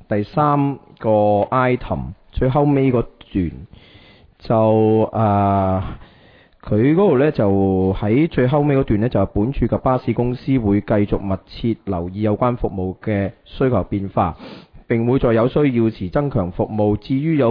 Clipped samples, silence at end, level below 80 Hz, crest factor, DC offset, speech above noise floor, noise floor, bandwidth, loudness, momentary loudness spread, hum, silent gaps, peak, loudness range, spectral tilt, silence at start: under 0.1%; 0 s; -36 dBFS; 16 dB; under 0.1%; 32 dB; -49 dBFS; 5.2 kHz; -18 LUFS; 8 LU; none; none; -2 dBFS; 4 LU; -11.5 dB/octave; 0.1 s